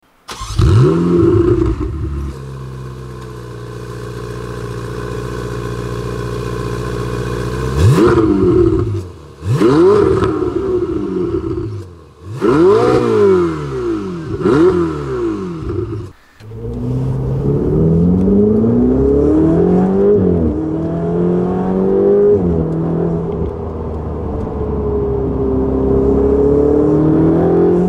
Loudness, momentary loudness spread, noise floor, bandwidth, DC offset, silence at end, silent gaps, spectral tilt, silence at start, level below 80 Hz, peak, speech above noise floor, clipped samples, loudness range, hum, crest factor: -14 LUFS; 15 LU; -34 dBFS; 13 kHz; under 0.1%; 0 s; none; -8.5 dB/octave; 0.3 s; -28 dBFS; -2 dBFS; 22 dB; under 0.1%; 10 LU; none; 12 dB